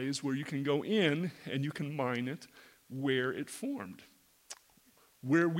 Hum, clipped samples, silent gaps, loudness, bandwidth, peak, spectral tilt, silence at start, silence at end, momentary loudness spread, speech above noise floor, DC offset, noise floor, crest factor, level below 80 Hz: none; under 0.1%; none; -34 LUFS; 16.5 kHz; -16 dBFS; -5.5 dB/octave; 0 s; 0 s; 21 LU; 32 dB; under 0.1%; -66 dBFS; 20 dB; -80 dBFS